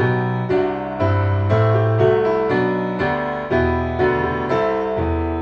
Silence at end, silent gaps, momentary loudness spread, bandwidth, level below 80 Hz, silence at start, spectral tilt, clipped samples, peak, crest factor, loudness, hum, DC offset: 0 s; none; 5 LU; 6.4 kHz; -36 dBFS; 0 s; -9 dB/octave; under 0.1%; -4 dBFS; 14 dB; -19 LUFS; none; under 0.1%